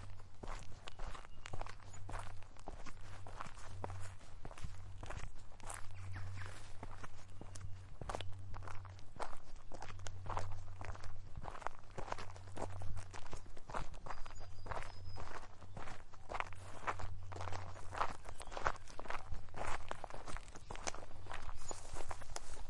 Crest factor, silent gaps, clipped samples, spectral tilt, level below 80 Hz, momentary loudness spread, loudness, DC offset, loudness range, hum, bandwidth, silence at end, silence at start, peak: 22 dB; none; under 0.1%; -4 dB/octave; -50 dBFS; 9 LU; -50 LUFS; under 0.1%; 6 LU; none; 11.5 kHz; 0 s; 0 s; -16 dBFS